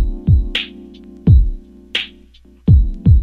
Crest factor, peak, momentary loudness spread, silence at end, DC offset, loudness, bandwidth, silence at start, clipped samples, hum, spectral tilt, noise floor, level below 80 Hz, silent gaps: 14 dB; 0 dBFS; 14 LU; 0 s; under 0.1%; -16 LUFS; 6.4 kHz; 0 s; under 0.1%; none; -7.5 dB/octave; -45 dBFS; -18 dBFS; none